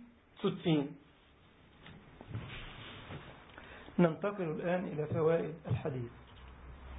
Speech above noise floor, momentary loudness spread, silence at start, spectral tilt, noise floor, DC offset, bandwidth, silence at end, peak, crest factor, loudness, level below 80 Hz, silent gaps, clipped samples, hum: 29 dB; 23 LU; 0 s; -6 dB/octave; -63 dBFS; under 0.1%; 3.9 kHz; 0 s; -14 dBFS; 24 dB; -36 LUFS; -58 dBFS; none; under 0.1%; none